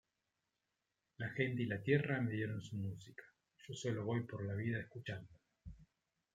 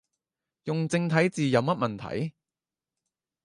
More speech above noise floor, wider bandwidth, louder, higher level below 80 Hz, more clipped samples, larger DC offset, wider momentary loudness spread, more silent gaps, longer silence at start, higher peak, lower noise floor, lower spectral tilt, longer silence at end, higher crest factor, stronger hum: second, 49 dB vs over 64 dB; second, 9.2 kHz vs 11 kHz; second, -41 LUFS vs -27 LUFS; about the same, -70 dBFS vs -66 dBFS; neither; neither; first, 23 LU vs 10 LU; neither; first, 1.2 s vs 0.65 s; second, -20 dBFS vs -8 dBFS; about the same, -89 dBFS vs under -90 dBFS; about the same, -7 dB/octave vs -6.5 dB/octave; second, 0.5 s vs 1.15 s; about the same, 22 dB vs 20 dB; neither